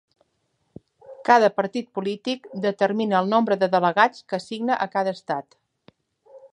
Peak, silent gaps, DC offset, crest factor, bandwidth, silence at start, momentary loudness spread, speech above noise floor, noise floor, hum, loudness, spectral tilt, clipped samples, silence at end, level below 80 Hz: -2 dBFS; none; under 0.1%; 22 dB; 10.5 kHz; 1.1 s; 12 LU; 50 dB; -72 dBFS; none; -22 LUFS; -5.5 dB/octave; under 0.1%; 0.15 s; -72 dBFS